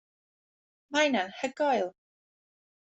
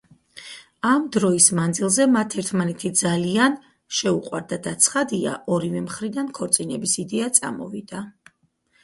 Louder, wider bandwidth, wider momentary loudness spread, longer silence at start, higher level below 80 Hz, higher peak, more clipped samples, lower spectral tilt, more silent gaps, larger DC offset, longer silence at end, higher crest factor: second, -29 LUFS vs -21 LUFS; second, 8.2 kHz vs 12 kHz; second, 8 LU vs 16 LU; first, 0.9 s vs 0.35 s; second, -78 dBFS vs -62 dBFS; second, -12 dBFS vs 0 dBFS; neither; about the same, -3 dB/octave vs -3.5 dB/octave; neither; neither; first, 1.05 s vs 0.75 s; about the same, 20 dB vs 22 dB